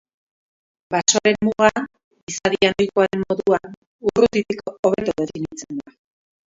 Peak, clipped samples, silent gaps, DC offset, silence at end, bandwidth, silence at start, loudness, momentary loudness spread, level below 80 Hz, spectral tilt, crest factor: 0 dBFS; under 0.1%; 2.04-2.11 s, 2.23-2.27 s, 3.77-3.99 s, 4.79-4.83 s; under 0.1%; 0.7 s; 7.8 kHz; 0.9 s; -20 LUFS; 13 LU; -52 dBFS; -3.5 dB/octave; 20 dB